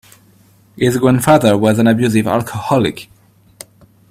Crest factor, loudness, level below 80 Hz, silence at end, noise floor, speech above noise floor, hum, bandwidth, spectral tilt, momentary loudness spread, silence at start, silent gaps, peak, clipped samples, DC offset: 16 dB; -13 LUFS; -48 dBFS; 1.05 s; -49 dBFS; 36 dB; none; 16 kHz; -6 dB/octave; 8 LU; 0.75 s; none; 0 dBFS; under 0.1%; under 0.1%